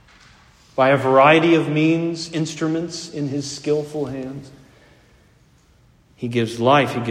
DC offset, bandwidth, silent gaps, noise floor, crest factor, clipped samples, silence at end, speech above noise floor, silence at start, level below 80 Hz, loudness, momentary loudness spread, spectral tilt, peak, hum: under 0.1%; 12 kHz; none; -54 dBFS; 20 dB; under 0.1%; 0 s; 36 dB; 0.75 s; -58 dBFS; -19 LUFS; 16 LU; -5.5 dB/octave; 0 dBFS; none